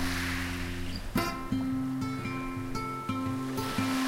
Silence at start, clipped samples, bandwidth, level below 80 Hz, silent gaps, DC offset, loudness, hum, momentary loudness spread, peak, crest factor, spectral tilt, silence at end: 0 s; under 0.1%; 16.5 kHz; -44 dBFS; none; under 0.1%; -33 LUFS; none; 4 LU; -16 dBFS; 16 dB; -5 dB/octave; 0 s